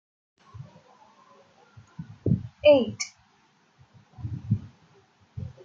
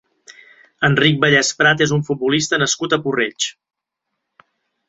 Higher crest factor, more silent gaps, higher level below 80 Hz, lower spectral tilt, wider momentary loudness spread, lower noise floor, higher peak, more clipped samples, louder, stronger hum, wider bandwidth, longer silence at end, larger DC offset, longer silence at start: about the same, 22 dB vs 18 dB; neither; about the same, -58 dBFS vs -54 dBFS; first, -6 dB/octave vs -3.5 dB/octave; first, 28 LU vs 7 LU; second, -64 dBFS vs -78 dBFS; second, -6 dBFS vs -2 dBFS; neither; second, -25 LUFS vs -16 LUFS; neither; about the same, 7.8 kHz vs 8.2 kHz; second, 0.15 s vs 1.35 s; neither; first, 0.55 s vs 0.3 s